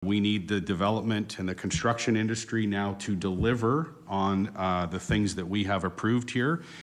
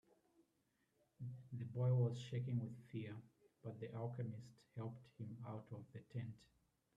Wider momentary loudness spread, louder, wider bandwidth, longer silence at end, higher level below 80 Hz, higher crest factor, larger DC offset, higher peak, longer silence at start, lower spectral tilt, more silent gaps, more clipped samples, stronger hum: second, 4 LU vs 16 LU; first, -29 LUFS vs -47 LUFS; first, 11.5 kHz vs 7.6 kHz; second, 0 s vs 0.55 s; first, -50 dBFS vs -82 dBFS; about the same, 14 dB vs 18 dB; neither; first, -14 dBFS vs -28 dBFS; second, 0 s vs 1.2 s; second, -5.5 dB/octave vs -8.5 dB/octave; neither; neither; neither